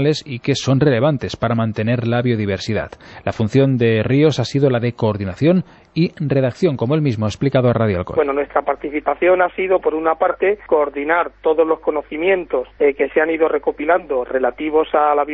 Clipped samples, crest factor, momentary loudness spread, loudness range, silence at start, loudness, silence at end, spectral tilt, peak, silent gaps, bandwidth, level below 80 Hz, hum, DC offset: under 0.1%; 16 dB; 6 LU; 1 LU; 0 s; -18 LUFS; 0 s; -7 dB/octave; -2 dBFS; none; 8.2 kHz; -48 dBFS; none; under 0.1%